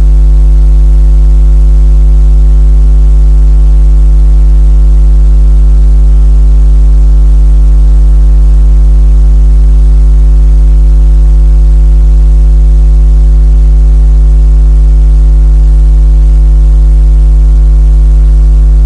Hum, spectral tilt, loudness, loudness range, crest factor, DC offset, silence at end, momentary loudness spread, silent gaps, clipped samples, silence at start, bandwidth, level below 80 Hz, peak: none; -9 dB/octave; -7 LUFS; 0 LU; 2 dB; 0.1%; 0 s; 0 LU; none; 0.2%; 0 s; 1.4 kHz; -2 dBFS; 0 dBFS